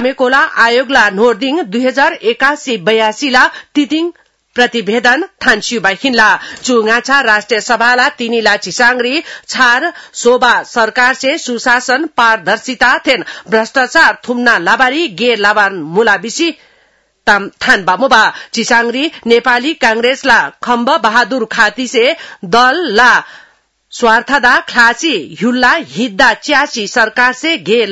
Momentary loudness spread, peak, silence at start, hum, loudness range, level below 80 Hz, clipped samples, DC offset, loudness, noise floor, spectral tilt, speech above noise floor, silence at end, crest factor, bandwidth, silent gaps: 6 LU; 0 dBFS; 0 s; none; 2 LU; -48 dBFS; 0.6%; 0.3%; -10 LUFS; -53 dBFS; -2.5 dB/octave; 42 dB; 0 s; 12 dB; 12 kHz; none